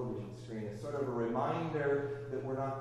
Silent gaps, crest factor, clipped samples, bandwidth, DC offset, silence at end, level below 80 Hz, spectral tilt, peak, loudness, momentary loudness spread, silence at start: none; 16 dB; under 0.1%; 11.5 kHz; under 0.1%; 0 s; -64 dBFS; -8 dB/octave; -20 dBFS; -37 LUFS; 9 LU; 0 s